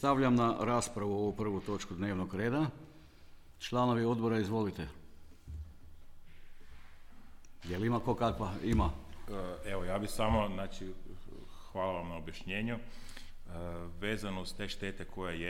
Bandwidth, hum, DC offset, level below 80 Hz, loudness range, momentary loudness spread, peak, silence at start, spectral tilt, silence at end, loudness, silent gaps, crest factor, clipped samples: 16 kHz; none; under 0.1%; -48 dBFS; 7 LU; 19 LU; -16 dBFS; 0 s; -6 dB/octave; 0 s; -35 LUFS; none; 18 dB; under 0.1%